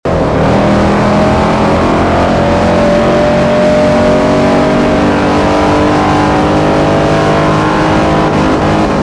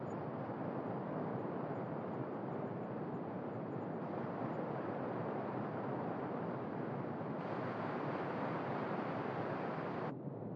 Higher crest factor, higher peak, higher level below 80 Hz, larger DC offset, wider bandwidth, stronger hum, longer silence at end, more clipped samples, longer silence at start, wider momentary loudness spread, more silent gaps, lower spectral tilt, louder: second, 8 dB vs 14 dB; first, 0 dBFS vs -28 dBFS; first, -24 dBFS vs -84 dBFS; neither; first, 11 kHz vs 7.4 kHz; neither; about the same, 0 s vs 0 s; neither; about the same, 0.05 s vs 0 s; about the same, 1 LU vs 3 LU; neither; second, -6.5 dB/octave vs -9.5 dB/octave; first, -9 LUFS vs -42 LUFS